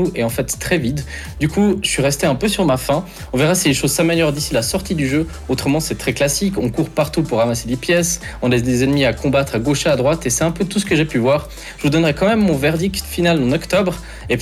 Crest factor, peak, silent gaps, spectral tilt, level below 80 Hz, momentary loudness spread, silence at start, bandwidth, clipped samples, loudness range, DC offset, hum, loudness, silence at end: 12 dB; -4 dBFS; none; -4.5 dB/octave; -36 dBFS; 6 LU; 0 s; 18 kHz; under 0.1%; 2 LU; under 0.1%; none; -17 LUFS; 0 s